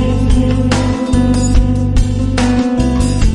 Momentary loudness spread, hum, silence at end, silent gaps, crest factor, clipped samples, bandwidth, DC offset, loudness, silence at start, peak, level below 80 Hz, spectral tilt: 2 LU; none; 0 s; none; 12 dB; under 0.1%; 11.5 kHz; under 0.1%; -13 LUFS; 0 s; 0 dBFS; -16 dBFS; -6.5 dB/octave